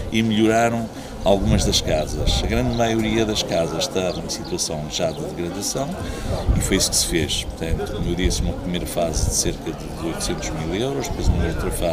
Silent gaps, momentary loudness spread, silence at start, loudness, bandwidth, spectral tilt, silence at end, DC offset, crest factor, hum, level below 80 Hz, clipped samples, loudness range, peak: none; 9 LU; 0 s; -22 LUFS; 16 kHz; -4 dB/octave; 0 s; under 0.1%; 20 dB; none; -28 dBFS; under 0.1%; 4 LU; -2 dBFS